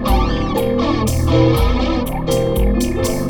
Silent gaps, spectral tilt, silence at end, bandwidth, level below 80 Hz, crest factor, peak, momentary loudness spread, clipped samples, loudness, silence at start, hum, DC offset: none; -6 dB/octave; 0 s; over 20 kHz; -20 dBFS; 14 dB; -2 dBFS; 5 LU; under 0.1%; -17 LUFS; 0 s; none; under 0.1%